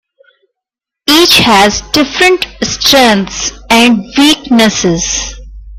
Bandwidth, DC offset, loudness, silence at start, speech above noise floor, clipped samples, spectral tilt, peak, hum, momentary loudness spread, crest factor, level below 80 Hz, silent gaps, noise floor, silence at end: over 20 kHz; under 0.1%; -8 LUFS; 1.05 s; 72 dB; 0.3%; -2.5 dB/octave; 0 dBFS; none; 11 LU; 10 dB; -32 dBFS; none; -81 dBFS; 0 s